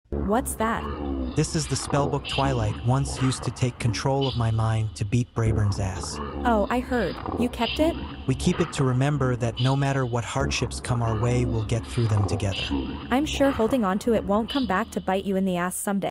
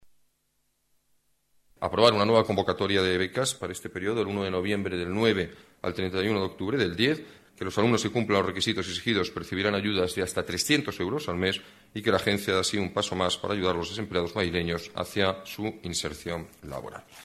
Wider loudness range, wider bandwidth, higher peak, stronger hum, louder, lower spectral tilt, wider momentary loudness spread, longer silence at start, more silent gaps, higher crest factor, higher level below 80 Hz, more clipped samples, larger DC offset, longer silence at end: about the same, 1 LU vs 3 LU; first, 16 kHz vs 14.5 kHz; second, -10 dBFS vs -6 dBFS; neither; about the same, -25 LUFS vs -27 LUFS; about the same, -5.5 dB/octave vs -4.5 dB/octave; second, 4 LU vs 10 LU; second, 0.1 s vs 1.8 s; neither; second, 16 dB vs 22 dB; first, -38 dBFS vs -56 dBFS; neither; neither; about the same, 0 s vs 0 s